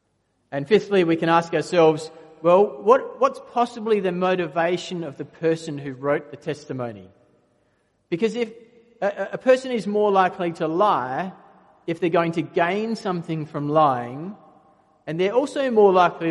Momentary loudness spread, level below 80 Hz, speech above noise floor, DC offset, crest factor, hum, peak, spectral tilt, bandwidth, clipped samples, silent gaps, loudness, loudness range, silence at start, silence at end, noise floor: 14 LU; -70 dBFS; 48 dB; under 0.1%; 20 dB; none; -2 dBFS; -6.5 dB/octave; 11.5 kHz; under 0.1%; none; -22 LUFS; 9 LU; 0.5 s; 0 s; -69 dBFS